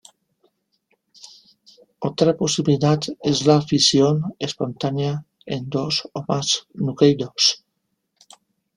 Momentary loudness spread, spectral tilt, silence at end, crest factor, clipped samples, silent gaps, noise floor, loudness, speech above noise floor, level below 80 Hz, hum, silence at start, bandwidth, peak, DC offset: 12 LU; -4.5 dB/octave; 1.2 s; 20 dB; under 0.1%; none; -75 dBFS; -20 LUFS; 55 dB; -58 dBFS; none; 1.25 s; 11.5 kHz; -2 dBFS; under 0.1%